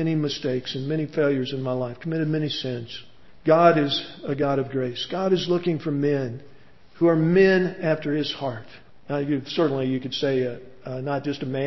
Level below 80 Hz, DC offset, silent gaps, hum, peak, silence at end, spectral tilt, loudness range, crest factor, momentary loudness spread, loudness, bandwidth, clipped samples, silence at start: -58 dBFS; 0.5%; none; none; -4 dBFS; 0 s; -7 dB/octave; 4 LU; 20 dB; 13 LU; -24 LUFS; 6.2 kHz; under 0.1%; 0 s